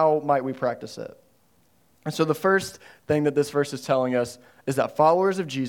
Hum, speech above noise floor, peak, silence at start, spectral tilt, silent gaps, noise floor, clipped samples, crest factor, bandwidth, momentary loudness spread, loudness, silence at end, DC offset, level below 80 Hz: none; 40 dB; -6 dBFS; 0 s; -5.5 dB/octave; none; -64 dBFS; under 0.1%; 18 dB; 18 kHz; 16 LU; -24 LUFS; 0 s; under 0.1%; -66 dBFS